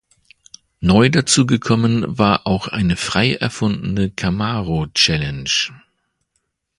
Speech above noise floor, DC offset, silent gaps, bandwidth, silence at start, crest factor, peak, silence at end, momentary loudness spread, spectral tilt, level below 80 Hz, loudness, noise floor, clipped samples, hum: 54 dB; under 0.1%; none; 11.5 kHz; 0.8 s; 18 dB; 0 dBFS; 1 s; 7 LU; -4.5 dB/octave; -40 dBFS; -17 LUFS; -71 dBFS; under 0.1%; none